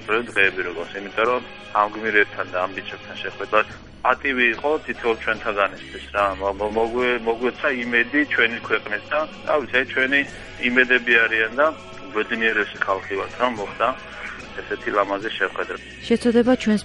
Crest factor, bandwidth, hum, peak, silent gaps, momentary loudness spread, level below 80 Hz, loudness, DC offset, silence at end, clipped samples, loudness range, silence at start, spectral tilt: 20 dB; 10.5 kHz; none; -2 dBFS; none; 12 LU; -50 dBFS; -21 LUFS; under 0.1%; 0 s; under 0.1%; 4 LU; 0 s; -4.5 dB/octave